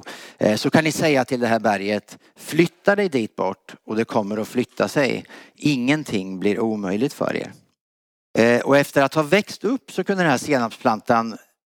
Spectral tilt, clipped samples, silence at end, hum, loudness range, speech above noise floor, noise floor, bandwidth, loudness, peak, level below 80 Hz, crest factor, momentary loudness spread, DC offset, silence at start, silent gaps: -5.5 dB/octave; under 0.1%; 0.3 s; none; 3 LU; over 69 dB; under -90 dBFS; 19 kHz; -21 LUFS; -2 dBFS; -66 dBFS; 20 dB; 9 LU; under 0.1%; 0.05 s; 7.81-8.34 s